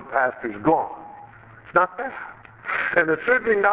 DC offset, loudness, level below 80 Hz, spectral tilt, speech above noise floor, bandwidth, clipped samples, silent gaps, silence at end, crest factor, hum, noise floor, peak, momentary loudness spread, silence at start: under 0.1%; -22 LUFS; -60 dBFS; -9 dB/octave; 24 dB; 4 kHz; under 0.1%; none; 0 s; 20 dB; none; -45 dBFS; -2 dBFS; 17 LU; 0 s